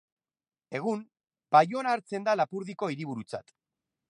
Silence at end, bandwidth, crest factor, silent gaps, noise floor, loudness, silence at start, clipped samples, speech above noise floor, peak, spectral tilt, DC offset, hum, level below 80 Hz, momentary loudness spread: 0.75 s; 10.5 kHz; 22 dB; none; under -90 dBFS; -29 LUFS; 0.7 s; under 0.1%; over 62 dB; -8 dBFS; -6 dB/octave; under 0.1%; none; -80 dBFS; 15 LU